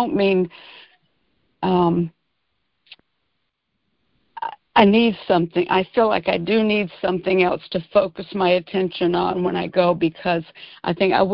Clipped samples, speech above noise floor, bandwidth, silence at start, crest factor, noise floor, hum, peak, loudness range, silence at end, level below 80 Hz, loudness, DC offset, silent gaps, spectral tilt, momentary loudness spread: under 0.1%; 55 dB; 5.6 kHz; 0 s; 20 dB; -74 dBFS; none; 0 dBFS; 8 LU; 0 s; -54 dBFS; -20 LUFS; under 0.1%; none; -9.5 dB/octave; 9 LU